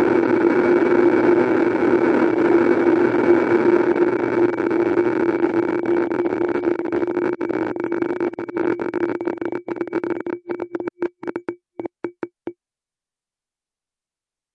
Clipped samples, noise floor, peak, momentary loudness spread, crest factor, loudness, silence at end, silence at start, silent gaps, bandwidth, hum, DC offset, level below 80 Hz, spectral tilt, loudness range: under 0.1%; under -90 dBFS; -2 dBFS; 14 LU; 18 dB; -19 LUFS; 2.05 s; 0 s; none; 6.2 kHz; none; under 0.1%; -62 dBFS; -8 dB/octave; 15 LU